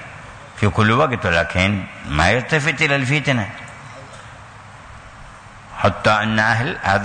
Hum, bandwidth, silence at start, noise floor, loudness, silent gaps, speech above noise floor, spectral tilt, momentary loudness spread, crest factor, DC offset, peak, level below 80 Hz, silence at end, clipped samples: none; 9.6 kHz; 0 s; -39 dBFS; -17 LUFS; none; 22 dB; -5.5 dB/octave; 22 LU; 16 dB; under 0.1%; -4 dBFS; -40 dBFS; 0 s; under 0.1%